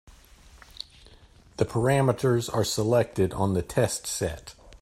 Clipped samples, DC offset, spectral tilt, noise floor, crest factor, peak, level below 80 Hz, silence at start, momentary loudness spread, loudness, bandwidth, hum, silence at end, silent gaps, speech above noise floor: under 0.1%; under 0.1%; -5.5 dB/octave; -54 dBFS; 18 dB; -8 dBFS; -50 dBFS; 0.1 s; 19 LU; -26 LUFS; 16 kHz; none; 0.05 s; none; 29 dB